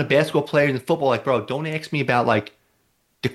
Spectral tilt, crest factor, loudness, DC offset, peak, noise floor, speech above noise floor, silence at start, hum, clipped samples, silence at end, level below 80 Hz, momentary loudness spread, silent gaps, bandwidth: -6.5 dB/octave; 16 dB; -21 LUFS; under 0.1%; -4 dBFS; -66 dBFS; 46 dB; 0 s; none; under 0.1%; 0 s; -62 dBFS; 7 LU; none; 12.5 kHz